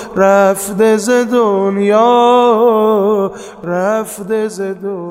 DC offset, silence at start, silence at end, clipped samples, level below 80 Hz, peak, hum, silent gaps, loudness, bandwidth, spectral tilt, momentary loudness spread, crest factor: under 0.1%; 0 s; 0 s; under 0.1%; -54 dBFS; 0 dBFS; none; none; -12 LUFS; 16 kHz; -5 dB/octave; 11 LU; 12 dB